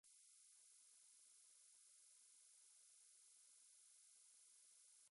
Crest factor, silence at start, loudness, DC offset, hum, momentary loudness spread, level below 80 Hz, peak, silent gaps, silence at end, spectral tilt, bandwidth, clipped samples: 14 dB; 0.05 s; -68 LUFS; under 0.1%; none; 0 LU; under -90 dBFS; -58 dBFS; none; 0 s; 4 dB/octave; 11.5 kHz; under 0.1%